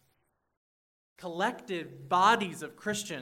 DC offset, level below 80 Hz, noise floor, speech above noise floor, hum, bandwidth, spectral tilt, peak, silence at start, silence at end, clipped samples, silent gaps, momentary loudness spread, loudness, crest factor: under 0.1%; -78 dBFS; -75 dBFS; 45 dB; none; 16 kHz; -3.5 dB/octave; -12 dBFS; 1.2 s; 0 s; under 0.1%; none; 14 LU; -30 LUFS; 22 dB